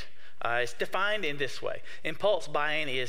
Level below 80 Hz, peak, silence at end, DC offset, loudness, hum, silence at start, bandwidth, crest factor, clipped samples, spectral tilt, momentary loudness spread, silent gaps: -66 dBFS; -12 dBFS; 0 s; 3%; -31 LUFS; none; 0 s; 16 kHz; 18 dB; under 0.1%; -3.5 dB/octave; 9 LU; none